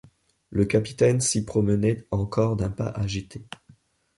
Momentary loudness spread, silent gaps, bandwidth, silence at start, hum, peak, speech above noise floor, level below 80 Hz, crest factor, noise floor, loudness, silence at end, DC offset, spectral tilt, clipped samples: 17 LU; none; 11.5 kHz; 0.5 s; none; -8 dBFS; 34 dB; -46 dBFS; 18 dB; -58 dBFS; -24 LUFS; 0.75 s; under 0.1%; -5.5 dB/octave; under 0.1%